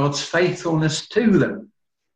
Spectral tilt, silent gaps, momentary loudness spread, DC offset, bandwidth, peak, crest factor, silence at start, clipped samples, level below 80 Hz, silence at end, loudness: -5.5 dB/octave; none; 5 LU; under 0.1%; 9.6 kHz; -6 dBFS; 14 dB; 0 s; under 0.1%; -52 dBFS; 0.5 s; -20 LUFS